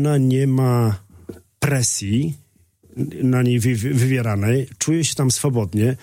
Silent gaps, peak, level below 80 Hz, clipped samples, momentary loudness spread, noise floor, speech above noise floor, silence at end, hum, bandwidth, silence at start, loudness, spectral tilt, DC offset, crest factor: none; -6 dBFS; -52 dBFS; under 0.1%; 9 LU; -53 dBFS; 35 dB; 0.05 s; none; 16.5 kHz; 0 s; -19 LUFS; -5.5 dB/octave; under 0.1%; 14 dB